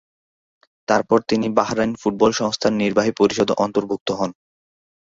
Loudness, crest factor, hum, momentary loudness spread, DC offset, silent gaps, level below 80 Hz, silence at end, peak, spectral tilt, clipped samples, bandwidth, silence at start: -20 LUFS; 18 dB; none; 7 LU; under 0.1%; 4.01-4.06 s; -56 dBFS; 0.7 s; -2 dBFS; -5 dB/octave; under 0.1%; 7.8 kHz; 0.9 s